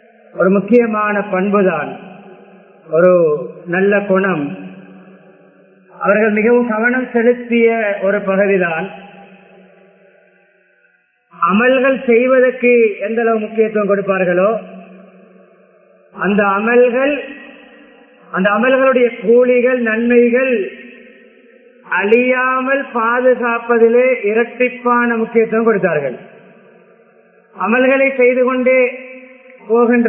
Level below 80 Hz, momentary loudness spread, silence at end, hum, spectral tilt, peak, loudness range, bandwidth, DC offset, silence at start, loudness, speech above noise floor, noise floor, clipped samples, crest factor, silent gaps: -62 dBFS; 10 LU; 0 s; none; -10 dB/octave; 0 dBFS; 4 LU; 3.4 kHz; under 0.1%; 0.35 s; -14 LUFS; 44 dB; -57 dBFS; under 0.1%; 14 dB; none